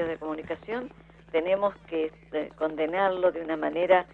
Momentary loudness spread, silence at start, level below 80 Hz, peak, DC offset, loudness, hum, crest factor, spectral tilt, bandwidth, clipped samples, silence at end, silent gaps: 10 LU; 0 s; -60 dBFS; -8 dBFS; under 0.1%; -29 LUFS; none; 20 dB; -7.5 dB/octave; 4.4 kHz; under 0.1%; 0.1 s; none